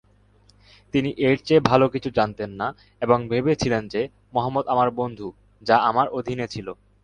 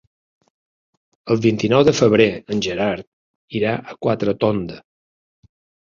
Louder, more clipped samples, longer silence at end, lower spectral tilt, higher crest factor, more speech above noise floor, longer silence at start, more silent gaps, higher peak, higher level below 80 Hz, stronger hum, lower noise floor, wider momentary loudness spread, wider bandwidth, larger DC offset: second, -22 LUFS vs -19 LUFS; neither; second, 0.3 s vs 1.15 s; about the same, -6.5 dB/octave vs -6 dB/octave; about the same, 22 dB vs 20 dB; second, 35 dB vs over 72 dB; second, 0.95 s vs 1.25 s; second, none vs 3.07-3.48 s; about the same, -2 dBFS vs -2 dBFS; about the same, -52 dBFS vs -52 dBFS; neither; second, -57 dBFS vs under -90 dBFS; about the same, 12 LU vs 13 LU; first, 9.8 kHz vs 7.6 kHz; neither